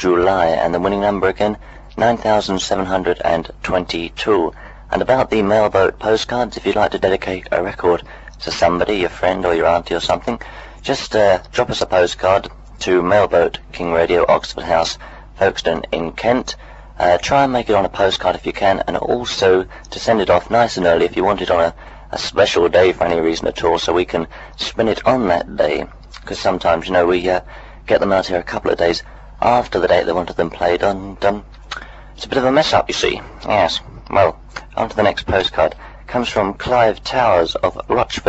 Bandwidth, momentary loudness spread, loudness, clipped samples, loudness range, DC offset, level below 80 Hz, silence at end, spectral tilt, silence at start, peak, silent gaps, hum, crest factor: 8.2 kHz; 10 LU; -17 LUFS; under 0.1%; 2 LU; under 0.1%; -38 dBFS; 0 s; -4.5 dB/octave; 0 s; 0 dBFS; none; none; 16 dB